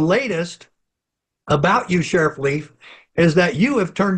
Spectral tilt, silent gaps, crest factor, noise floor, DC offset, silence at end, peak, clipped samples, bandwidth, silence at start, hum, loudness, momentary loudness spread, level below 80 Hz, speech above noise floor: -6 dB/octave; none; 16 dB; -82 dBFS; under 0.1%; 0 s; -4 dBFS; under 0.1%; 9.4 kHz; 0 s; none; -18 LUFS; 10 LU; -50 dBFS; 64 dB